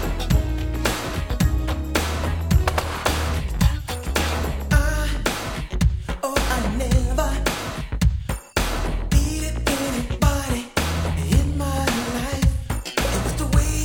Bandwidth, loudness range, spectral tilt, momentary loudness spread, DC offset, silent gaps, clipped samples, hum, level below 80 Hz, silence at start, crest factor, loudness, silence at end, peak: 18.5 kHz; 1 LU; -5 dB/octave; 5 LU; under 0.1%; none; under 0.1%; none; -24 dBFS; 0 s; 18 dB; -23 LUFS; 0 s; -4 dBFS